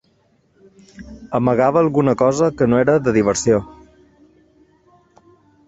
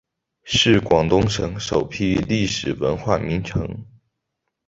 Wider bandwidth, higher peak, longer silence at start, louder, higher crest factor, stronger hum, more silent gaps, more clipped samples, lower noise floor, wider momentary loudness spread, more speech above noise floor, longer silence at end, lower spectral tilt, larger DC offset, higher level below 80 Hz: about the same, 8.2 kHz vs 8 kHz; about the same, -2 dBFS vs -2 dBFS; first, 1 s vs 0.45 s; first, -16 LUFS vs -20 LUFS; about the same, 16 dB vs 20 dB; neither; neither; neither; second, -60 dBFS vs -78 dBFS; second, 7 LU vs 10 LU; second, 43 dB vs 58 dB; first, 1.95 s vs 0.85 s; about the same, -6 dB/octave vs -5 dB/octave; neither; second, -48 dBFS vs -40 dBFS